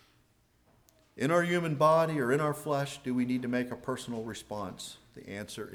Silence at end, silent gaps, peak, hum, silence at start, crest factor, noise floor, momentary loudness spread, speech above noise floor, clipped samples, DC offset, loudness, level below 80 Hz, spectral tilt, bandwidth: 0 s; none; -14 dBFS; none; 1.15 s; 18 dB; -68 dBFS; 16 LU; 37 dB; under 0.1%; under 0.1%; -31 LUFS; -66 dBFS; -6 dB/octave; 19.5 kHz